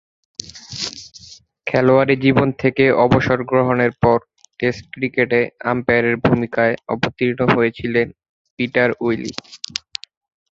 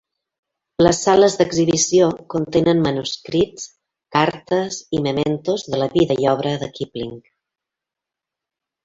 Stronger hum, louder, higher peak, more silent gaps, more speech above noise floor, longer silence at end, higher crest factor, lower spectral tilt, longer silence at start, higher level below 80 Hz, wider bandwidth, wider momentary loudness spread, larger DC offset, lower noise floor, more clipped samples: neither; about the same, -18 LUFS vs -18 LUFS; about the same, 0 dBFS vs -2 dBFS; first, 8.29-8.57 s vs none; second, 27 dB vs 68 dB; second, 0.95 s vs 1.65 s; about the same, 18 dB vs 18 dB; first, -6 dB/octave vs -4.5 dB/octave; second, 0.45 s vs 0.8 s; about the same, -46 dBFS vs -50 dBFS; about the same, 7.8 kHz vs 8 kHz; about the same, 15 LU vs 13 LU; neither; second, -44 dBFS vs -86 dBFS; neither